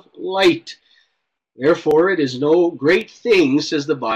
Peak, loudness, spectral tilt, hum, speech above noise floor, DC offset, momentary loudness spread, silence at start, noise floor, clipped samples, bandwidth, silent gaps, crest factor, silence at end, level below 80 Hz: -6 dBFS; -17 LUFS; -5 dB/octave; none; 56 dB; under 0.1%; 6 LU; 0.15 s; -72 dBFS; under 0.1%; 10 kHz; none; 12 dB; 0 s; -58 dBFS